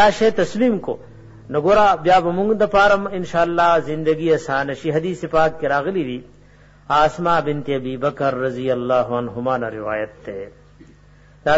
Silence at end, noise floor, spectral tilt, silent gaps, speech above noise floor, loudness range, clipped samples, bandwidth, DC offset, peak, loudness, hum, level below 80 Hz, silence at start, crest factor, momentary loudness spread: 0 s; -48 dBFS; -6 dB/octave; none; 30 dB; 6 LU; under 0.1%; 8 kHz; under 0.1%; -4 dBFS; -19 LUFS; 50 Hz at -50 dBFS; -46 dBFS; 0 s; 14 dB; 11 LU